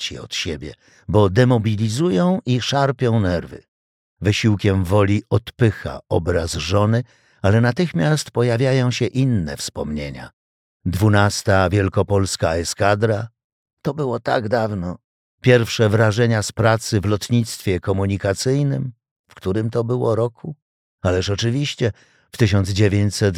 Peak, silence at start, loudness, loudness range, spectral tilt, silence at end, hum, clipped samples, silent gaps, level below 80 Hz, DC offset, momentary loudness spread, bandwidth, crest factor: -2 dBFS; 0 s; -19 LUFS; 3 LU; -6 dB/octave; 0 s; none; under 0.1%; 3.68-4.16 s, 10.33-10.80 s, 13.44-13.66 s, 13.73-13.77 s, 15.04-15.38 s, 19.11-19.24 s, 20.62-20.98 s; -44 dBFS; under 0.1%; 11 LU; 15 kHz; 18 dB